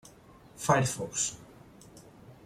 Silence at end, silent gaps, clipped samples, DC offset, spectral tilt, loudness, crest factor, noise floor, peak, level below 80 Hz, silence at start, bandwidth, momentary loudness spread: 0.1 s; none; under 0.1%; under 0.1%; -4 dB/octave; -29 LUFS; 24 dB; -55 dBFS; -10 dBFS; -62 dBFS; 0.55 s; 15.5 kHz; 9 LU